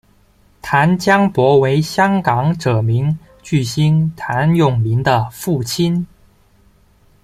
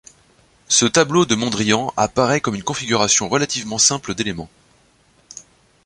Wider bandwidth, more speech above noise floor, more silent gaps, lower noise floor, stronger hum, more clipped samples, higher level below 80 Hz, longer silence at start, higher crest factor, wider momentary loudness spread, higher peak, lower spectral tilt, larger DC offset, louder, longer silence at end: first, 15.5 kHz vs 11.5 kHz; about the same, 38 dB vs 38 dB; neither; second, -52 dBFS vs -56 dBFS; neither; neither; about the same, -46 dBFS vs -50 dBFS; about the same, 0.65 s vs 0.7 s; second, 14 dB vs 20 dB; second, 8 LU vs 15 LU; about the same, -2 dBFS vs 0 dBFS; first, -6.5 dB/octave vs -3 dB/octave; neither; about the same, -15 LUFS vs -17 LUFS; first, 1.2 s vs 0.45 s